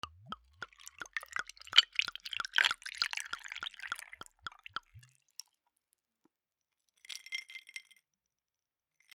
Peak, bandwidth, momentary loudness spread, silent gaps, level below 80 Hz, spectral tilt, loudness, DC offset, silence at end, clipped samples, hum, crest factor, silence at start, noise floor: -6 dBFS; over 20 kHz; 23 LU; none; -74 dBFS; 1.5 dB/octave; -33 LUFS; under 0.1%; 1.35 s; under 0.1%; none; 34 dB; 0.05 s; under -90 dBFS